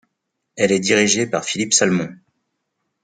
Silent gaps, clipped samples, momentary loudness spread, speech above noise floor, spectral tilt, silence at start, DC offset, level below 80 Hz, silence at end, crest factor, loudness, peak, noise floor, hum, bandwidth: none; under 0.1%; 7 LU; 58 dB; -3 dB/octave; 0.55 s; under 0.1%; -62 dBFS; 0.9 s; 20 dB; -17 LUFS; -2 dBFS; -76 dBFS; none; 10 kHz